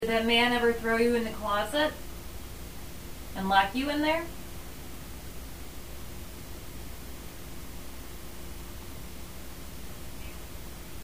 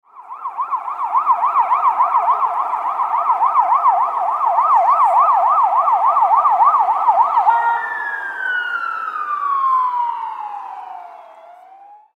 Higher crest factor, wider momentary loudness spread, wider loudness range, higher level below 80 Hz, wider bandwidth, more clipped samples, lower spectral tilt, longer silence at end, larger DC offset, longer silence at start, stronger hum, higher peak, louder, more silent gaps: first, 22 dB vs 14 dB; first, 19 LU vs 13 LU; first, 14 LU vs 7 LU; first, -46 dBFS vs under -90 dBFS; first, 16 kHz vs 8.8 kHz; neither; first, -4 dB/octave vs -1.5 dB/octave; second, 0 s vs 0.25 s; first, 0.7% vs under 0.1%; second, 0 s vs 0.15 s; neither; second, -10 dBFS vs -2 dBFS; second, -27 LUFS vs -16 LUFS; neither